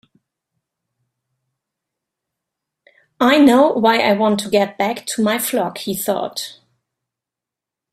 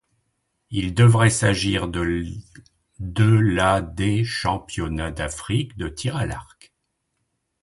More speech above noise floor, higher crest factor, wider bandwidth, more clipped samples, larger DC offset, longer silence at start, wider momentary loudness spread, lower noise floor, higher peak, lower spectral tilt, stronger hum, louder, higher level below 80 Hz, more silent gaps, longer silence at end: first, 70 dB vs 54 dB; about the same, 18 dB vs 18 dB; first, 16 kHz vs 11.5 kHz; neither; neither; first, 3.2 s vs 0.7 s; about the same, 11 LU vs 13 LU; first, -86 dBFS vs -75 dBFS; first, 0 dBFS vs -4 dBFS; second, -4 dB/octave vs -5.5 dB/octave; neither; first, -16 LUFS vs -21 LUFS; second, -62 dBFS vs -40 dBFS; neither; first, 1.4 s vs 1.2 s